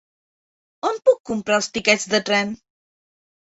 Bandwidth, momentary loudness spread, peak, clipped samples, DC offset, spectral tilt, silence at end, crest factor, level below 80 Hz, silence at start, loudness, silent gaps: 8 kHz; 9 LU; -2 dBFS; under 0.1%; under 0.1%; -2.5 dB/octave; 0.95 s; 20 dB; -62 dBFS; 0.85 s; -20 LUFS; 1.20-1.24 s